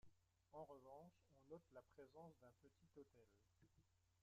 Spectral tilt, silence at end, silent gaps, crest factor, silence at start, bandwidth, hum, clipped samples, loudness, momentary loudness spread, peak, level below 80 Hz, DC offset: -6.5 dB/octave; 0 s; none; 18 dB; 0.05 s; 7.6 kHz; none; under 0.1%; -65 LUFS; 7 LU; -48 dBFS; -88 dBFS; under 0.1%